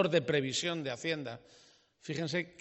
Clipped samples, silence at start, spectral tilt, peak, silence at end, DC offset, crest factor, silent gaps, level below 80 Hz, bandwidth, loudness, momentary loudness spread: under 0.1%; 0 s; -4.5 dB/octave; -16 dBFS; 0.1 s; under 0.1%; 20 dB; none; -74 dBFS; 8.2 kHz; -34 LUFS; 15 LU